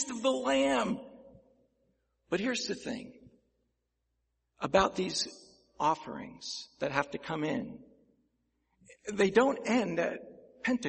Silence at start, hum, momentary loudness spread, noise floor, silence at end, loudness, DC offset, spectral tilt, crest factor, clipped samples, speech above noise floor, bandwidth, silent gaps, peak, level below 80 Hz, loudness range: 0 s; none; 15 LU; -81 dBFS; 0 s; -32 LUFS; under 0.1%; -4 dB/octave; 24 dB; under 0.1%; 50 dB; 8.4 kHz; none; -10 dBFS; -64 dBFS; 7 LU